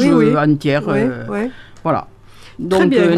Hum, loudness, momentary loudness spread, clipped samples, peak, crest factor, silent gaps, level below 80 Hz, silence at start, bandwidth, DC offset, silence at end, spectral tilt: none; -16 LUFS; 12 LU; under 0.1%; -2 dBFS; 14 dB; none; -46 dBFS; 0 s; 13.5 kHz; under 0.1%; 0 s; -7 dB/octave